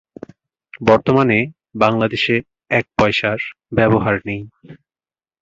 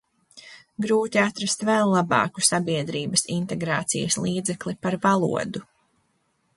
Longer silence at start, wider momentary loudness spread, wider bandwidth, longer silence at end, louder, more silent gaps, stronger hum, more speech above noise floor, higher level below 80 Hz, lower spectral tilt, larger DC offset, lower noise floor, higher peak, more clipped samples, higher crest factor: first, 0.75 s vs 0.35 s; first, 11 LU vs 8 LU; second, 7.8 kHz vs 12 kHz; second, 0.65 s vs 0.95 s; first, -17 LUFS vs -23 LUFS; neither; neither; first, over 73 dB vs 46 dB; first, -46 dBFS vs -62 dBFS; first, -7 dB/octave vs -4 dB/octave; neither; first, under -90 dBFS vs -70 dBFS; about the same, -2 dBFS vs -4 dBFS; neither; about the same, 18 dB vs 20 dB